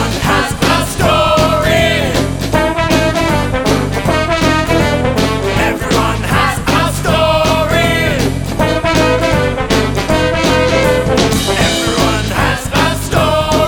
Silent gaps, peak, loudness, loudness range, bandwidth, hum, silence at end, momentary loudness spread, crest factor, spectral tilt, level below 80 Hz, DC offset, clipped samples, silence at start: none; 0 dBFS; -12 LUFS; 1 LU; over 20 kHz; none; 0 s; 3 LU; 12 dB; -4.5 dB/octave; -24 dBFS; under 0.1%; under 0.1%; 0 s